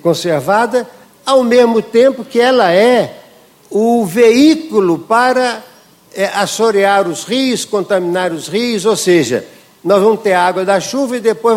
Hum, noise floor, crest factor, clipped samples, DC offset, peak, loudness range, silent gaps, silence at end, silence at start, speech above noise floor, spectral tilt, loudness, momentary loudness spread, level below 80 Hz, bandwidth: none; -44 dBFS; 12 dB; under 0.1%; under 0.1%; 0 dBFS; 3 LU; none; 0 s; 0.05 s; 32 dB; -4.5 dB/octave; -12 LUFS; 8 LU; -58 dBFS; 16.5 kHz